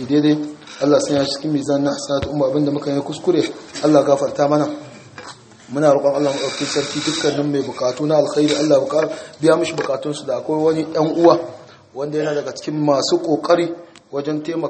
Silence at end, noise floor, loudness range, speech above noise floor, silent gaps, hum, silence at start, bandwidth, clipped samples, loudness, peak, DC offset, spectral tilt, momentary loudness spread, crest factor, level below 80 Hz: 0 s; -39 dBFS; 2 LU; 21 dB; none; none; 0 s; 8.8 kHz; under 0.1%; -18 LUFS; 0 dBFS; under 0.1%; -5 dB/octave; 11 LU; 18 dB; -54 dBFS